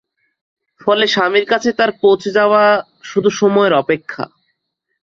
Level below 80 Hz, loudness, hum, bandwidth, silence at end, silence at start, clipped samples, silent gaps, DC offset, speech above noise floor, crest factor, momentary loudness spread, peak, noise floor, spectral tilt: -60 dBFS; -14 LUFS; none; 7.6 kHz; 0.8 s; 0.85 s; under 0.1%; none; under 0.1%; 59 dB; 14 dB; 10 LU; -2 dBFS; -72 dBFS; -4.5 dB/octave